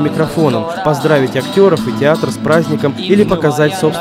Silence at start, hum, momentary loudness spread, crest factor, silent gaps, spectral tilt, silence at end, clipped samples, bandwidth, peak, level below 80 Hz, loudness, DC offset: 0 s; none; 5 LU; 12 dB; none; -6 dB/octave; 0 s; under 0.1%; 16 kHz; 0 dBFS; -44 dBFS; -13 LUFS; under 0.1%